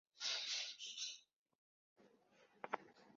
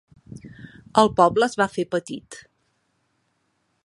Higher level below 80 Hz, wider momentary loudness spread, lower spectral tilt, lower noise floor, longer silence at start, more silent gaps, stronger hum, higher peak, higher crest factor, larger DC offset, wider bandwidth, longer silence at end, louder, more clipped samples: second, under -90 dBFS vs -56 dBFS; second, 12 LU vs 26 LU; second, 3 dB/octave vs -5 dB/octave; about the same, -73 dBFS vs -71 dBFS; second, 0.15 s vs 0.35 s; first, 1.36-1.46 s, 1.55-1.96 s vs none; neither; second, -24 dBFS vs -2 dBFS; about the same, 28 dB vs 24 dB; neither; second, 7.6 kHz vs 11.5 kHz; second, 0 s vs 1.45 s; second, -45 LUFS vs -20 LUFS; neither